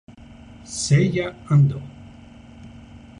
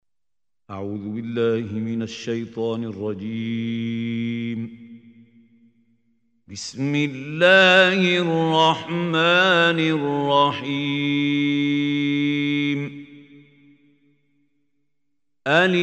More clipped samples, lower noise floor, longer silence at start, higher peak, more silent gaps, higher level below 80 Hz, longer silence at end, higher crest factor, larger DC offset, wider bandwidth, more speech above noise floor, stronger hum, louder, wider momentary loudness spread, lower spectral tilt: neither; second, -44 dBFS vs -90 dBFS; second, 0.1 s vs 0.7 s; second, -6 dBFS vs -2 dBFS; neither; first, -48 dBFS vs -70 dBFS; first, 0.2 s vs 0 s; about the same, 16 dB vs 20 dB; neither; first, 10.5 kHz vs 8.8 kHz; second, 25 dB vs 70 dB; neither; about the same, -20 LUFS vs -20 LUFS; first, 25 LU vs 15 LU; about the same, -6 dB/octave vs -5.5 dB/octave